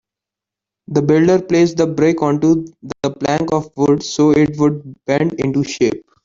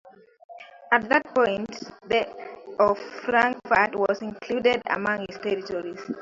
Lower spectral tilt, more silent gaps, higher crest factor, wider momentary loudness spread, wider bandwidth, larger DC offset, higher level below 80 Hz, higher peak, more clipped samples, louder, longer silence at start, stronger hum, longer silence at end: first, -6.5 dB/octave vs -5 dB/octave; second, none vs 0.44-0.49 s; second, 14 dB vs 22 dB; second, 7 LU vs 14 LU; about the same, 7.6 kHz vs 7.6 kHz; neither; first, -50 dBFS vs -62 dBFS; about the same, -2 dBFS vs -4 dBFS; neither; first, -16 LUFS vs -24 LUFS; first, 0.9 s vs 0.05 s; neither; first, 0.25 s vs 0 s